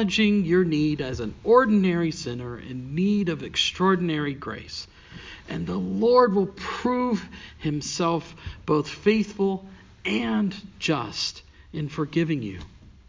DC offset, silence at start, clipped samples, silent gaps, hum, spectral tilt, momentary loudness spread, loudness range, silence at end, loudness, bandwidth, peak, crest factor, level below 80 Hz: under 0.1%; 0 s; under 0.1%; none; none; -5.5 dB/octave; 16 LU; 4 LU; 0.2 s; -24 LUFS; 7.6 kHz; -6 dBFS; 20 dB; -50 dBFS